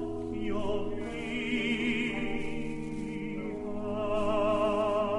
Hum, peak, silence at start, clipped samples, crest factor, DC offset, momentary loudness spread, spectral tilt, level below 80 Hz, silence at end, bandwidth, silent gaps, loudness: none; -18 dBFS; 0 s; under 0.1%; 14 dB; under 0.1%; 9 LU; -6 dB/octave; -48 dBFS; 0 s; 11 kHz; none; -32 LUFS